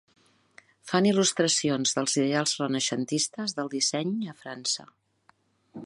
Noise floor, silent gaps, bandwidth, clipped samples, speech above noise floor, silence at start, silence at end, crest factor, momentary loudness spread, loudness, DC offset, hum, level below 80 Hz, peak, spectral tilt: -65 dBFS; none; 11.5 kHz; under 0.1%; 38 dB; 0.85 s; 0 s; 20 dB; 9 LU; -26 LUFS; under 0.1%; none; -76 dBFS; -8 dBFS; -3 dB/octave